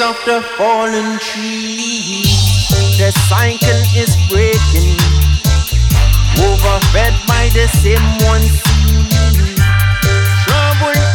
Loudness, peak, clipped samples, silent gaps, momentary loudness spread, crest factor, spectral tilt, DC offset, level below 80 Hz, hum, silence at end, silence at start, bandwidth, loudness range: -12 LUFS; 0 dBFS; under 0.1%; none; 5 LU; 10 dB; -4.5 dB/octave; under 0.1%; -14 dBFS; none; 0 s; 0 s; over 20 kHz; 1 LU